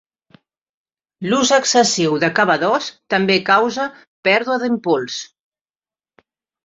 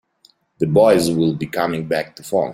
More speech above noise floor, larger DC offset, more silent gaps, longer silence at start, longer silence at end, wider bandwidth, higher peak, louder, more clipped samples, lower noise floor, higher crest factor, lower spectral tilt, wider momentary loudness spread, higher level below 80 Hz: first, over 73 dB vs 40 dB; neither; first, 4.07-4.23 s vs none; first, 1.2 s vs 0.6 s; first, 1.4 s vs 0 s; second, 8.2 kHz vs 16.5 kHz; about the same, -2 dBFS vs -2 dBFS; about the same, -16 LUFS vs -18 LUFS; neither; first, under -90 dBFS vs -57 dBFS; about the same, 18 dB vs 16 dB; second, -3 dB/octave vs -6 dB/octave; about the same, 12 LU vs 10 LU; second, -64 dBFS vs -54 dBFS